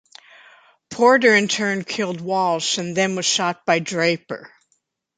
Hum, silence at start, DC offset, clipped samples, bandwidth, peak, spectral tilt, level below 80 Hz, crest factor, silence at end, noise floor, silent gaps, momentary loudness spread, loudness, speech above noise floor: none; 0.9 s; under 0.1%; under 0.1%; 9.6 kHz; -2 dBFS; -3 dB/octave; -68 dBFS; 18 dB; 0.7 s; -69 dBFS; none; 11 LU; -19 LUFS; 50 dB